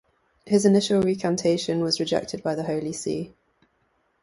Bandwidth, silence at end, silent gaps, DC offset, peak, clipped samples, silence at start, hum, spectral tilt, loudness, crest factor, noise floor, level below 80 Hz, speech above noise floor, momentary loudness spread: 11.5 kHz; 0.95 s; none; under 0.1%; -6 dBFS; under 0.1%; 0.45 s; none; -5 dB/octave; -24 LUFS; 18 dB; -69 dBFS; -60 dBFS; 46 dB; 10 LU